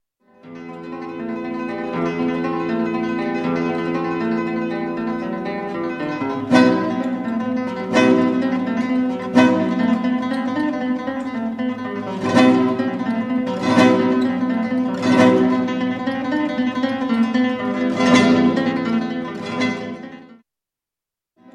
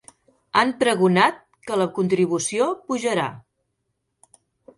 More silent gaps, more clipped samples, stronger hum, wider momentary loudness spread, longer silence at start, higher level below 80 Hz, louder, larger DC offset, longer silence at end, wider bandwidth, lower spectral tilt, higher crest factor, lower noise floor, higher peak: neither; neither; neither; first, 11 LU vs 8 LU; about the same, 0.45 s vs 0.55 s; first, -58 dBFS vs -66 dBFS; about the same, -19 LUFS vs -21 LUFS; neither; about the same, 1.3 s vs 1.4 s; second, 10 kHz vs 11.5 kHz; first, -6 dB/octave vs -4.5 dB/octave; about the same, 18 dB vs 20 dB; first, -87 dBFS vs -76 dBFS; first, 0 dBFS vs -4 dBFS